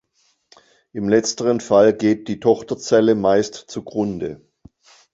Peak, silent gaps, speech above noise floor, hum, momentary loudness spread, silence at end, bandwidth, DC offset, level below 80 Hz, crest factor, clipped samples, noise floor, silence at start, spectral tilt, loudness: -2 dBFS; none; 46 dB; none; 13 LU; 0.8 s; 8 kHz; under 0.1%; -56 dBFS; 18 dB; under 0.1%; -64 dBFS; 0.95 s; -5 dB/octave; -18 LUFS